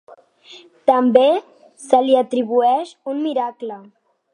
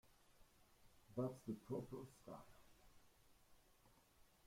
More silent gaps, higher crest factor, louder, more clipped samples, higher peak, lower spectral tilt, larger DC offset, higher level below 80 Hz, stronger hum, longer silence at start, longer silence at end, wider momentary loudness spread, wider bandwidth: neither; about the same, 18 dB vs 20 dB; first, -17 LUFS vs -52 LUFS; neither; first, 0 dBFS vs -34 dBFS; second, -5 dB/octave vs -7.5 dB/octave; neither; about the same, -76 dBFS vs -76 dBFS; neither; first, 0.5 s vs 0.05 s; first, 0.55 s vs 0.2 s; about the same, 13 LU vs 13 LU; second, 10.5 kHz vs 16.5 kHz